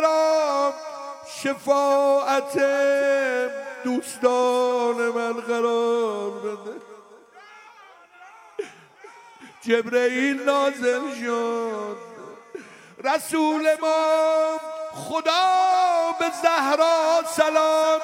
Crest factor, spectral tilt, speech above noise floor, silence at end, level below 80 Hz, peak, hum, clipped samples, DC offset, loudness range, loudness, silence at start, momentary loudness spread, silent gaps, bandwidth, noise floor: 18 dB; -2.5 dB/octave; 28 dB; 0 s; -78 dBFS; -6 dBFS; none; under 0.1%; under 0.1%; 8 LU; -22 LUFS; 0 s; 17 LU; none; 16.5 kHz; -49 dBFS